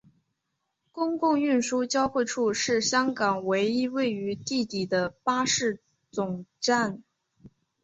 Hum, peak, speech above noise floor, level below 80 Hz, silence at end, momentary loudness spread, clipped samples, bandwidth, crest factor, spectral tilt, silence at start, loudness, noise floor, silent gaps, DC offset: none; -10 dBFS; 54 dB; -66 dBFS; 0.35 s; 8 LU; under 0.1%; 8.2 kHz; 18 dB; -3.5 dB/octave; 0.95 s; -27 LUFS; -80 dBFS; none; under 0.1%